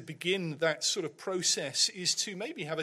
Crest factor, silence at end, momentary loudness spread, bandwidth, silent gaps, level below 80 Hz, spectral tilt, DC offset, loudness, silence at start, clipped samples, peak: 18 dB; 0 s; 8 LU; 15.5 kHz; none; -82 dBFS; -2 dB/octave; under 0.1%; -30 LUFS; 0 s; under 0.1%; -14 dBFS